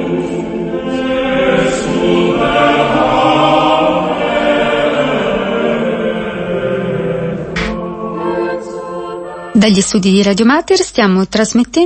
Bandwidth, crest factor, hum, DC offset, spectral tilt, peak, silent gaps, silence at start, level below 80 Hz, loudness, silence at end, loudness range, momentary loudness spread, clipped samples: 8.8 kHz; 12 dB; none; under 0.1%; -5 dB/octave; 0 dBFS; none; 0 s; -38 dBFS; -13 LUFS; 0 s; 6 LU; 9 LU; under 0.1%